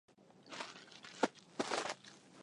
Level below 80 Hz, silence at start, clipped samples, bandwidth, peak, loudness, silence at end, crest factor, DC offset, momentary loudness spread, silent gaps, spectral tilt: -86 dBFS; 0.2 s; under 0.1%; 11.5 kHz; -18 dBFS; -42 LUFS; 0 s; 26 dB; under 0.1%; 14 LU; none; -2.5 dB/octave